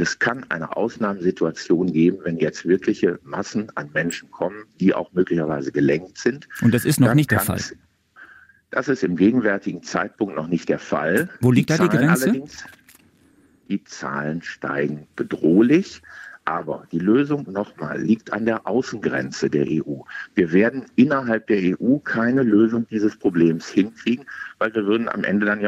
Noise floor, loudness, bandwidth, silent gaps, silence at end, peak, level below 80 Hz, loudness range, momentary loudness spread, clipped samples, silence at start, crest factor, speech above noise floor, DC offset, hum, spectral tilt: -56 dBFS; -21 LUFS; 16 kHz; none; 0 s; -2 dBFS; -58 dBFS; 4 LU; 11 LU; under 0.1%; 0 s; 18 dB; 36 dB; under 0.1%; none; -6.5 dB/octave